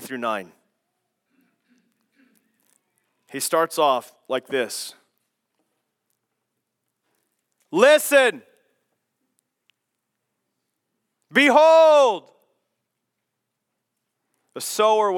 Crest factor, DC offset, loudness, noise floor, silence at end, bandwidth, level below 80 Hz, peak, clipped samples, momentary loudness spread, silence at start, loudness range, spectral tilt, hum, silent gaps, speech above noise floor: 22 dB; under 0.1%; -18 LUFS; -80 dBFS; 0 s; 18 kHz; under -90 dBFS; -2 dBFS; under 0.1%; 18 LU; 0 s; 13 LU; -2.5 dB/octave; none; none; 62 dB